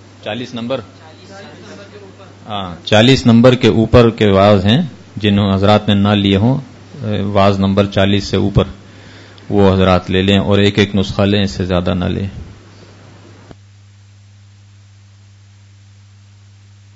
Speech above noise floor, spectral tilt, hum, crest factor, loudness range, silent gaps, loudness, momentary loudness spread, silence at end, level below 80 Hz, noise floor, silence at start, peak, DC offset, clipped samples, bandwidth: 30 dB; -7 dB/octave; none; 14 dB; 9 LU; none; -13 LUFS; 16 LU; 4.45 s; -38 dBFS; -42 dBFS; 0.25 s; 0 dBFS; under 0.1%; 0.2%; 8 kHz